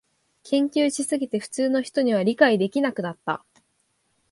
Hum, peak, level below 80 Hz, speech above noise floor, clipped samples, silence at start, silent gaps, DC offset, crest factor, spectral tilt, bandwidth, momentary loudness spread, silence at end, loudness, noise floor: none; -4 dBFS; -72 dBFS; 47 dB; under 0.1%; 0.45 s; none; under 0.1%; 20 dB; -4.5 dB/octave; 11.5 kHz; 11 LU; 0.95 s; -23 LUFS; -70 dBFS